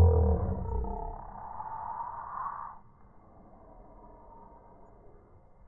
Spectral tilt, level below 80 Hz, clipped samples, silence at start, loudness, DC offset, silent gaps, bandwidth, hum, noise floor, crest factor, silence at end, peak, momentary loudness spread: -14 dB/octave; -40 dBFS; under 0.1%; 0 s; -34 LUFS; under 0.1%; none; 2.1 kHz; none; -56 dBFS; 20 dB; 0.15 s; -12 dBFS; 26 LU